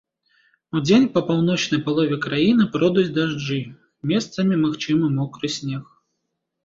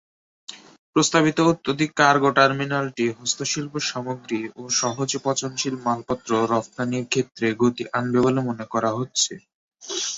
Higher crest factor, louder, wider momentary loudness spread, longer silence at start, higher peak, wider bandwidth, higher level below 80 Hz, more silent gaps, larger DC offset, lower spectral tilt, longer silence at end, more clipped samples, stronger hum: second, 16 dB vs 22 dB; about the same, -21 LUFS vs -22 LUFS; about the same, 11 LU vs 11 LU; first, 0.75 s vs 0.5 s; about the same, -4 dBFS vs -2 dBFS; about the same, 7.8 kHz vs 8.2 kHz; about the same, -58 dBFS vs -62 dBFS; second, none vs 0.78-0.93 s, 9.54-9.71 s; neither; first, -6 dB/octave vs -3.5 dB/octave; first, 0.8 s vs 0 s; neither; neither